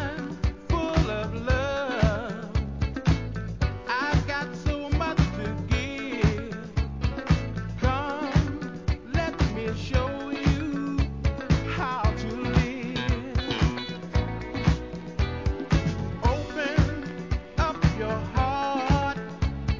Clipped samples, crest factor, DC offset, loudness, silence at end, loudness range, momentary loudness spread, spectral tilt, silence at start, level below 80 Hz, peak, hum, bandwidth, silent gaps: under 0.1%; 18 dB; 0.2%; -27 LUFS; 0 s; 1 LU; 6 LU; -6.5 dB/octave; 0 s; -32 dBFS; -8 dBFS; none; 7.6 kHz; none